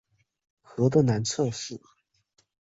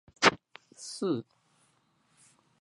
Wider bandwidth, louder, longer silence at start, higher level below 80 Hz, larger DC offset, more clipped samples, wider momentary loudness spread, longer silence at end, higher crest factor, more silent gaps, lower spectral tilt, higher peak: second, 8 kHz vs 11.5 kHz; first, -26 LUFS vs -29 LUFS; first, 0.75 s vs 0.2 s; first, -64 dBFS vs -70 dBFS; neither; neither; about the same, 18 LU vs 20 LU; second, 0.85 s vs 1.4 s; second, 20 dB vs 28 dB; neither; first, -6 dB/octave vs -3 dB/octave; second, -10 dBFS vs -6 dBFS